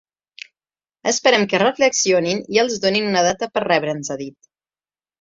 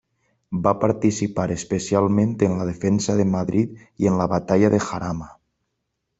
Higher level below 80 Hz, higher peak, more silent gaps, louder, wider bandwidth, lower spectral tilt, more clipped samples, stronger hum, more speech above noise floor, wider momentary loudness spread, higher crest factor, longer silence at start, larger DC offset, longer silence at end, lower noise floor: second, -62 dBFS vs -52 dBFS; about the same, -2 dBFS vs -2 dBFS; neither; first, -18 LUFS vs -21 LUFS; about the same, 7.8 kHz vs 8.2 kHz; second, -3 dB/octave vs -6.5 dB/octave; neither; neither; first, over 72 dB vs 56 dB; first, 15 LU vs 8 LU; about the same, 18 dB vs 18 dB; first, 1.05 s vs 0.5 s; neither; about the same, 0.9 s vs 0.85 s; first, under -90 dBFS vs -77 dBFS